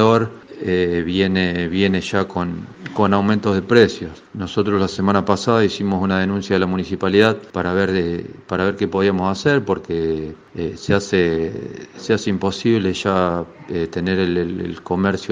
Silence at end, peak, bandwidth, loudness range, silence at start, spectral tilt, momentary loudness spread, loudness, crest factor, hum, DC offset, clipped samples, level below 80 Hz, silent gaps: 0 s; 0 dBFS; 9.4 kHz; 3 LU; 0 s; -6.5 dB/octave; 11 LU; -19 LUFS; 18 dB; none; under 0.1%; under 0.1%; -52 dBFS; none